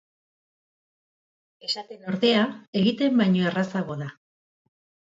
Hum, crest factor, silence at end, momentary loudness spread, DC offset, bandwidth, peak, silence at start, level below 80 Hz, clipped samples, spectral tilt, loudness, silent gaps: none; 18 dB; 0.95 s; 12 LU; under 0.1%; 7.8 kHz; -8 dBFS; 1.65 s; -70 dBFS; under 0.1%; -6.5 dB/octave; -24 LUFS; 2.68-2.73 s